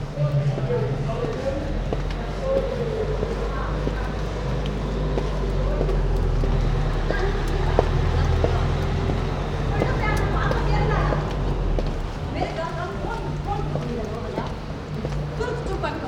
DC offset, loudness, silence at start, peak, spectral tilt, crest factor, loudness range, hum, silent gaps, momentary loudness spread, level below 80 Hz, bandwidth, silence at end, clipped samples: under 0.1%; -25 LUFS; 0 s; 0 dBFS; -7 dB/octave; 22 dB; 5 LU; none; none; 6 LU; -28 dBFS; 9.2 kHz; 0 s; under 0.1%